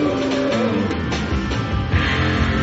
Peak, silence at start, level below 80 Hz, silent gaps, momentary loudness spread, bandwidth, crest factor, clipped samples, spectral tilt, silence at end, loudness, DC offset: -6 dBFS; 0 s; -28 dBFS; none; 4 LU; 8 kHz; 14 dB; under 0.1%; -5 dB/octave; 0 s; -20 LUFS; under 0.1%